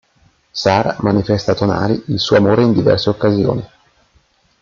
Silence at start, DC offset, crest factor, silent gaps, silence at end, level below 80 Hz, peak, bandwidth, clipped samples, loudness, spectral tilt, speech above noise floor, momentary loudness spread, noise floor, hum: 0.55 s; under 0.1%; 14 dB; none; 0.95 s; -46 dBFS; 0 dBFS; 7.4 kHz; under 0.1%; -15 LUFS; -6.5 dB/octave; 42 dB; 7 LU; -56 dBFS; none